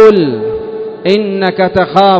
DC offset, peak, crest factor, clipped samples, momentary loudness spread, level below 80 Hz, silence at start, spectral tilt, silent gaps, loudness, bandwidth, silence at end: under 0.1%; 0 dBFS; 10 dB; 3%; 10 LU; -42 dBFS; 0 s; -7 dB/octave; none; -12 LUFS; 8 kHz; 0 s